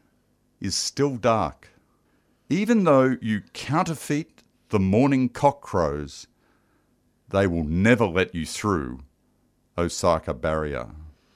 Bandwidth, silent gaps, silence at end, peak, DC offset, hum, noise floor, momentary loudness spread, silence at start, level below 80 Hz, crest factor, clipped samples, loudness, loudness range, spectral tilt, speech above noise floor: 15 kHz; none; 0.25 s; -4 dBFS; under 0.1%; 50 Hz at -50 dBFS; -66 dBFS; 14 LU; 0.6 s; -46 dBFS; 22 dB; under 0.1%; -24 LUFS; 2 LU; -5.5 dB/octave; 43 dB